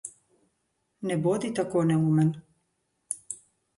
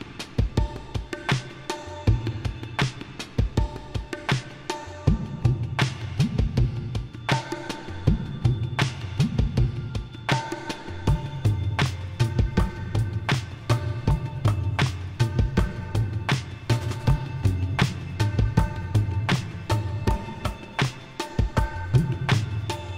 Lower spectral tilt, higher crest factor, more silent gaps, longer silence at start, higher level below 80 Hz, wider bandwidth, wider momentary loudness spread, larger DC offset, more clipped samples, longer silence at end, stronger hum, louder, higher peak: about the same, -6.5 dB/octave vs -6 dB/octave; about the same, 16 dB vs 18 dB; neither; about the same, 0.05 s vs 0 s; second, -68 dBFS vs -34 dBFS; second, 11.5 kHz vs 15 kHz; first, 17 LU vs 8 LU; neither; neither; first, 0.45 s vs 0 s; neither; about the same, -27 LUFS vs -27 LUFS; second, -12 dBFS vs -6 dBFS